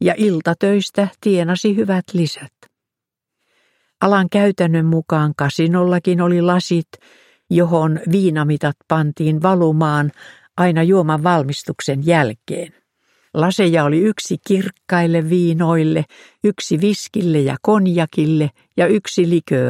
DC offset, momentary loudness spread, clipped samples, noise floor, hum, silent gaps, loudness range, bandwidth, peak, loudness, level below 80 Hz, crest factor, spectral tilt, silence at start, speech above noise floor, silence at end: under 0.1%; 7 LU; under 0.1%; -84 dBFS; none; none; 3 LU; 13 kHz; 0 dBFS; -17 LUFS; -62 dBFS; 16 dB; -6.5 dB/octave; 0 s; 68 dB; 0 s